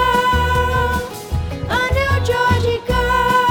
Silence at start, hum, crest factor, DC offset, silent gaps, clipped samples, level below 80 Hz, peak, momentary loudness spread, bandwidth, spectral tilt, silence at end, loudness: 0 s; none; 14 dB; under 0.1%; none; under 0.1%; -26 dBFS; -2 dBFS; 9 LU; 19.5 kHz; -5 dB/octave; 0 s; -17 LUFS